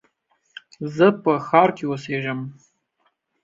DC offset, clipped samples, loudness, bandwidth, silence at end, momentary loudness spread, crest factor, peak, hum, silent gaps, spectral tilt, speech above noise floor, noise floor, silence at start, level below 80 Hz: under 0.1%; under 0.1%; -20 LUFS; 7.6 kHz; 0.9 s; 15 LU; 20 dB; -2 dBFS; none; none; -7 dB/octave; 49 dB; -69 dBFS; 0.8 s; -66 dBFS